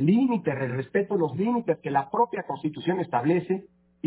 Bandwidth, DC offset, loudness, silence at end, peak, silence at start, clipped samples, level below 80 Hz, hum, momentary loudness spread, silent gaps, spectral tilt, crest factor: 4 kHz; under 0.1%; -26 LUFS; 0 s; -10 dBFS; 0 s; under 0.1%; -68 dBFS; none; 6 LU; none; -11.5 dB/octave; 16 dB